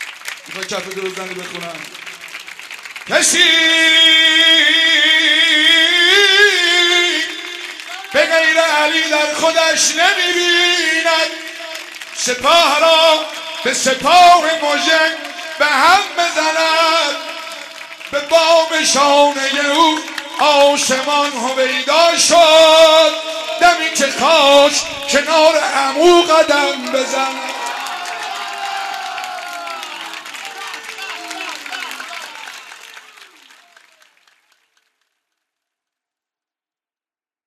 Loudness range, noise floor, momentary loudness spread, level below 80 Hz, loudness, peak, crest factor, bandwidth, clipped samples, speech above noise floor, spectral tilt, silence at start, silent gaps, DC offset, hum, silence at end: 16 LU; under -90 dBFS; 19 LU; -58 dBFS; -11 LUFS; -2 dBFS; 14 dB; 14 kHz; under 0.1%; over 78 dB; 0 dB/octave; 0 s; none; under 0.1%; none; 4.5 s